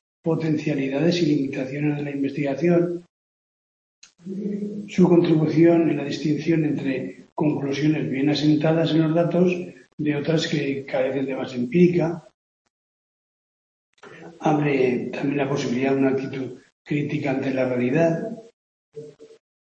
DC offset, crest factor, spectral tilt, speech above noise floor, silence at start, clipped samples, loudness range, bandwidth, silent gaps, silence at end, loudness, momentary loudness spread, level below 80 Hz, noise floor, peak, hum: under 0.1%; 18 dB; -7.5 dB/octave; over 69 dB; 0.25 s; under 0.1%; 5 LU; 7.6 kHz; 3.09-4.02 s, 7.32-7.36 s, 9.93-9.98 s, 12.34-13.93 s, 16.72-16.85 s, 18.53-18.92 s; 0.3 s; -22 LUFS; 12 LU; -64 dBFS; under -90 dBFS; -4 dBFS; none